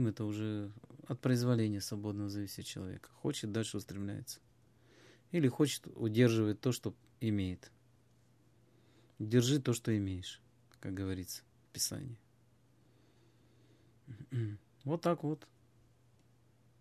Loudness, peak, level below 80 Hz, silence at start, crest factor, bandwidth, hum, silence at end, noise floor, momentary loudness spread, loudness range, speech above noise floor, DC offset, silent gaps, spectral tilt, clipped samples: -36 LUFS; -14 dBFS; -62 dBFS; 0 s; 24 dB; 14.5 kHz; none; 1.4 s; -69 dBFS; 17 LU; 9 LU; 33 dB; under 0.1%; none; -5.5 dB/octave; under 0.1%